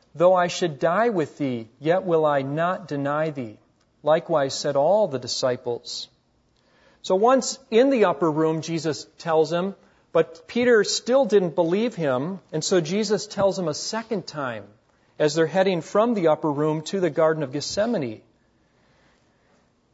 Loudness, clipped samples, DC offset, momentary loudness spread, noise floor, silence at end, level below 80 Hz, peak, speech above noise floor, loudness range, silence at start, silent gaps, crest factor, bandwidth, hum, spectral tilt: -23 LUFS; under 0.1%; under 0.1%; 10 LU; -64 dBFS; 1.75 s; -68 dBFS; -6 dBFS; 42 dB; 3 LU; 0.15 s; none; 16 dB; 8 kHz; none; -5 dB/octave